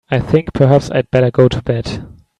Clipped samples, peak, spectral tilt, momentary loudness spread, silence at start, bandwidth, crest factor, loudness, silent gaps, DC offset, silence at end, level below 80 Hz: under 0.1%; 0 dBFS; -7.5 dB/octave; 9 LU; 0.1 s; 9.6 kHz; 14 dB; -14 LUFS; none; under 0.1%; 0.3 s; -36 dBFS